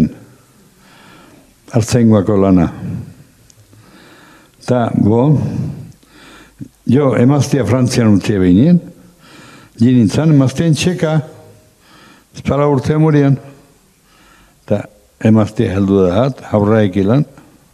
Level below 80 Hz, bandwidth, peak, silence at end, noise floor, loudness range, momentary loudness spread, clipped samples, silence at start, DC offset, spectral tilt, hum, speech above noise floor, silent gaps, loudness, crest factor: -44 dBFS; 13.5 kHz; 0 dBFS; 0.5 s; -50 dBFS; 4 LU; 13 LU; under 0.1%; 0 s; under 0.1%; -7.5 dB/octave; none; 38 dB; none; -13 LUFS; 14 dB